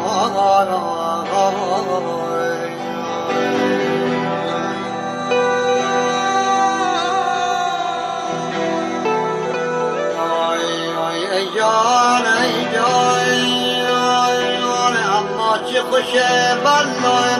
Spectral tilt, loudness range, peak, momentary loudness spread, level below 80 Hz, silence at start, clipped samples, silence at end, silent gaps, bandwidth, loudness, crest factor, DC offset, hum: -3 dB/octave; 5 LU; -4 dBFS; 7 LU; -62 dBFS; 0 s; under 0.1%; 0 s; none; 13 kHz; -17 LUFS; 14 dB; under 0.1%; none